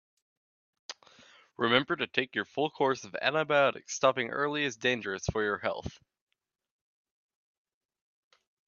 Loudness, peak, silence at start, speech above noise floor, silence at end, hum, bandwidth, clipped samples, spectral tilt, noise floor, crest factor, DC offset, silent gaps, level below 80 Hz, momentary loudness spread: -30 LUFS; -8 dBFS; 0.9 s; 29 dB; 2.75 s; none; 7.4 kHz; under 0.1%; -3.5 dB/octave; -59 dBFS; 26 dB; under 0.1%; none; -60 dBFS; 19 LU